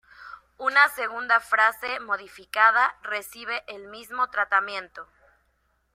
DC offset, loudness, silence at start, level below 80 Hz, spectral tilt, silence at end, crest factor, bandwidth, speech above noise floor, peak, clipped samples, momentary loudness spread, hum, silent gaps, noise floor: under 0.1%; -23 LUFS; 0.2 s; -68 dBFS; -0.5 dB/octave; 0.9 s; 22 dB; 16 kHz; 45 dB; -4 dBFS; under 0.1%; 21 LU; none; none; -70 dBFS